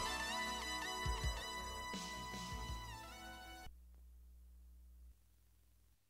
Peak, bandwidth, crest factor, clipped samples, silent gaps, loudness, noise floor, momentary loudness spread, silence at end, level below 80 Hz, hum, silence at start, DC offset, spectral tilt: -28 dBFS; 16 kHz; 18 dB; under 0.1%; none; -44 LUFS; -72 dBFS; 23 LU; 0.15 s; -54 dBFS; none; 0 s; under 0.1%; -2.5 dB/octave